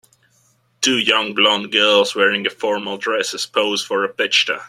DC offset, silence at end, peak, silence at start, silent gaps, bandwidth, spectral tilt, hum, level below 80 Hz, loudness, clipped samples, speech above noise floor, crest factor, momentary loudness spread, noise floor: under 0.1%; 0 s; 0 dBFS; 0.8 s; none; 14 kHz; -1.5 dB/octave; none; -68 dBFS; -17 LUFS; under 0.1%; 42 dB; 18 dB; 7 LU; -60 dBFS